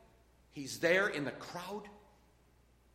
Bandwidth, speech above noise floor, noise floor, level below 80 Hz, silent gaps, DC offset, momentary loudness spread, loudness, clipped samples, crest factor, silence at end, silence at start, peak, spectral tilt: 16 kHz; 31 dB; -67 dBFS; -70 dBFS; none; under 0.1%; 20 LU; -35 LUFS; under 0.1%; 22 dB; 0.95 s; 0.55 s; -16 dBFS; -4 dB/octave